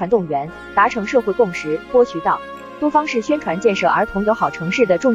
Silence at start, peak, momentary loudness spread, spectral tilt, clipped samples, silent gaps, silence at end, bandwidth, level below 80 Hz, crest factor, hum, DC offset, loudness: 0 s; -4 dBFS; 7 LU; -5.5 dB/octave; under 0.1%; none; 0 s; 7.8 kHz; -48 dBFS; 14 dB; none; under 0.1%; -18 LUFS